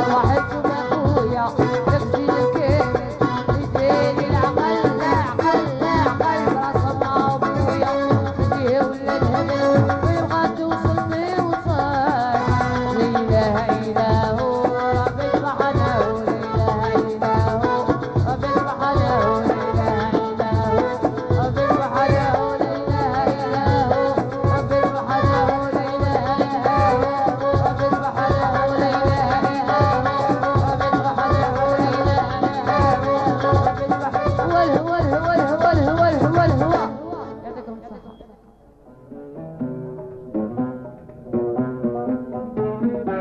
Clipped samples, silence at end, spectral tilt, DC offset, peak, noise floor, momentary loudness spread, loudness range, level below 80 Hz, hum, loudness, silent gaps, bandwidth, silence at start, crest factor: under 0.1%; 0 s; -8 dB/octave; under 0.1%; -4 dBFS; -49 dBFS; 6 LU; 5 LU; -38 dBFS; none; -20 LUFS; none; 8.2 kHz; 0 s; 14 dB